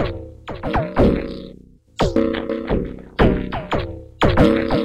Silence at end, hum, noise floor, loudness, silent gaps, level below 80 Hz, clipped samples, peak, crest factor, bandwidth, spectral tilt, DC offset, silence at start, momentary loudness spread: 0 s; none; -44 dBFS; -20 LUFS; none; -30 dBFS; under 0.1%; -2 dBFS; 18 dB; 14.5 kHz; -7.5 dB/octave; under 0.1%; 0 s; 17 LU